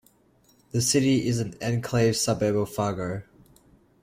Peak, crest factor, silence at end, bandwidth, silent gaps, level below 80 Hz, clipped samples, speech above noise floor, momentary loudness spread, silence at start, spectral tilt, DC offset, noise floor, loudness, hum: -10 dBFS; 16 dB; 0.8 s; 16.5 kHz; none; -54 dBFS; under 0.1%; 37 dB; 10 LU; 0.75 s; -5 dB/octave; under 0.1%; -62 dBFS; -25 LUFS; none